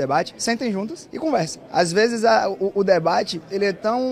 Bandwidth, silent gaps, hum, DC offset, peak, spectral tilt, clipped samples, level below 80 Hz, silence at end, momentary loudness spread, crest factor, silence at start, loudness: 14 kHz; none; none; under 0.1%; -4 dBFS; -4.5 dB/octave; under 0.1%; -60 dBFS; 0 s; 8 LU; 16 dB; 0 s; -21 LUFS